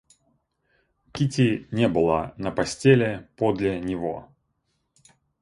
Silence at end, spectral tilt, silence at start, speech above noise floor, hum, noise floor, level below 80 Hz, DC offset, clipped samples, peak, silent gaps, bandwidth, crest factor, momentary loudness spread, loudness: 1.15 s; -6.5 dB/octave; 1.15 s; 51 dB; none; -74 dBFS; -52 dBFS; under 0.1%; under 0.1%; -4 dBFS; none; 11.5 kHz; 20 dB; 11 LU; -24 LUFS